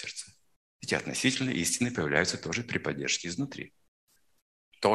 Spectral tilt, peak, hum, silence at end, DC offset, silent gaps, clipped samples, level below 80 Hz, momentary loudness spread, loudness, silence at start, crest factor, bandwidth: -3.5 dB/octave; -8 dBFS; none; 0 s; under 0.1%; 0.56-0.80 s, 3.88-4.07 s, 4.42-4.72 s; under 0.1%; -66 dBFS; 15 LU; -30 LUFS; 0 s; 24 dB; 13 kHz